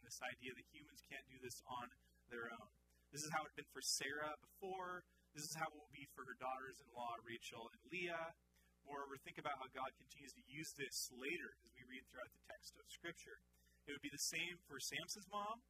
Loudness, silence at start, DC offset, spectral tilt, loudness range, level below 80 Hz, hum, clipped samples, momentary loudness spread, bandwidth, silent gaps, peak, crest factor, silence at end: -50 LUFS; 0 s; under 0.1%; -2 dB/octave; 4 LU; -80 dBFS; none; under 0.1%; 14 LU; 15.5 kHz; none; -30 dBFS; 22 dB; 0.1 s